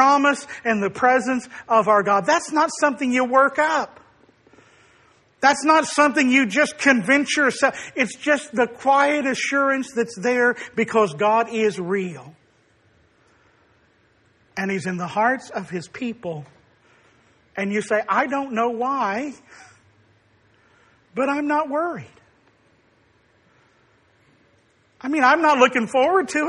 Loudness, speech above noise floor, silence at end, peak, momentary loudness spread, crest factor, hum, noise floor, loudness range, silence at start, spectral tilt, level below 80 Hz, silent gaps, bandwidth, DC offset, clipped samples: -20 LUFS; 40 dB; 0 s; -2 dBFS; 12 LU; 20 dB; none; -60 dBFS; 9 LU; 0 s; -4 dB/octave; -68 dBFS; none; 11 kHz; under 0.1%; under 0.1%